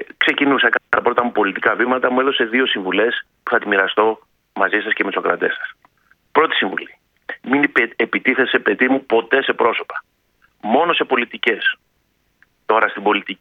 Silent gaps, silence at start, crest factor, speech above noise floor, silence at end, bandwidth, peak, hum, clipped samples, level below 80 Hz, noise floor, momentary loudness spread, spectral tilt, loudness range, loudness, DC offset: none; 0 s; 18 dB; 47 dB; 0.05 s; 6 kHz; 0 dBFS; none; under 0.1%; -66 dBFS; -65 dBFS; 13 LU; -6 dB/octave; 3 LU; -17 LUFS; under 0.1%